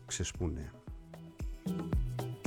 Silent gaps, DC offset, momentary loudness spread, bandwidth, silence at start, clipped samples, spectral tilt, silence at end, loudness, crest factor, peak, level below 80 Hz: none; under 0.1%; 14 LU; 17.5 kHz; 0 s; under 0.1%; -5 dB/octave; 0 s; -39 LUFS; 14 dB; -24 dBFS; -42 dBFS